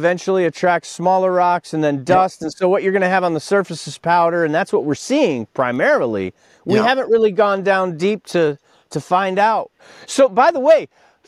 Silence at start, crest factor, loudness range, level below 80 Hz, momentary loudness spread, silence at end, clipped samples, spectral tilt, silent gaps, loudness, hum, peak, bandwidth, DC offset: 0 s; 16 dB; 1 LU; -62 dBFS; 9 LU; 0.45 s; under 0.1%; -5.5 dB/octave; none; -17 LUFS; none; -2 dBFS; 12.5 kHz; under 0.1%